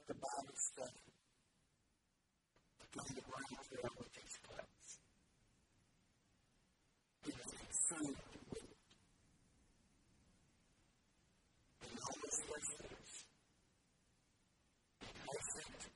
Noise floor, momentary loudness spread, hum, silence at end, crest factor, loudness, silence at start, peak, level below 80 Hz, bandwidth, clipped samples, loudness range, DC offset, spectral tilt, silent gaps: -84 dBFS; 16 LU; none; 0 s; 26 dB; -47 LUFS; 0 s; -26 dBFS; -74 dBFS; 11.5 kHz; under 0.1%; 12 LU; under 0.1%; -2.5 dB/octave; none